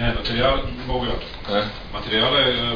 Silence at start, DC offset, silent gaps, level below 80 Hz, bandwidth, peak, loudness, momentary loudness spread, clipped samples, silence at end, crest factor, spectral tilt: 0 s; under 0.1%; none; -32 dBFS; 5.2 kHz; -6 dBFS; -21 LUFS; 11 LU; under 0.1%; 0 s; 16 dB; -6.5 dB/octave